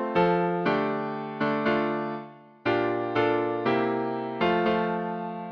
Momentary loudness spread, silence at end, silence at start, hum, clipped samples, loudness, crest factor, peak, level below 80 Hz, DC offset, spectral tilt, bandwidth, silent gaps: 9 LU; 0 s; 0 s; none; under 0.1%; -27 LUFS; 14 dB; -12 dBFS; -62 dBFS; under 0.1%; -8 dB/octave; 6.4 kHz; none